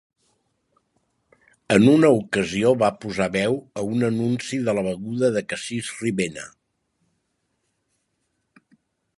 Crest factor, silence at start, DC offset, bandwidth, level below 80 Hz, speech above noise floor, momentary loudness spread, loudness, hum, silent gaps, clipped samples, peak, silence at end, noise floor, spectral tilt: 22 dB; 1.7 s; under 0.1%; 11.5 kHz; -58 dBFS; 53 dB; 12 LU; -22 LUFS; none; none; under 0.1%; -2 dBFS; 2.7 s; -74 dBFS; -6 dB/octave